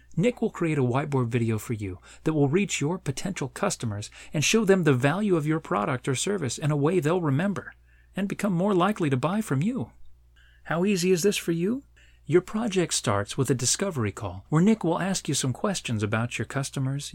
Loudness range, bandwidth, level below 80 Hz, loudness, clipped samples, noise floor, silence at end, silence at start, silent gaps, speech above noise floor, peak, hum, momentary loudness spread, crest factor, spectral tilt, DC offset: 3 LU; 17 kHz; -54 dBFS; -26 LUFS; under 0.1%; -56 dBFS; 0 s; 0.1 s; none; 30 dB; -8 dBFS; none; 9 LU; 18 dB; -5 dB/octave; under 0.1%